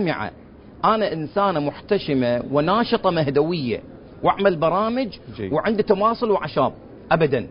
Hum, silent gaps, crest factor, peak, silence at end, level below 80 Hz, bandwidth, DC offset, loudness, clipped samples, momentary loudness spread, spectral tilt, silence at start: none; none; 18 dB; -4 dBFS; 0 s; -50 dBFS; 5.4 kHz; under 0.1%; -21 LUFS; under 0.1%; 7 LU; -11 dB/octave; 0 s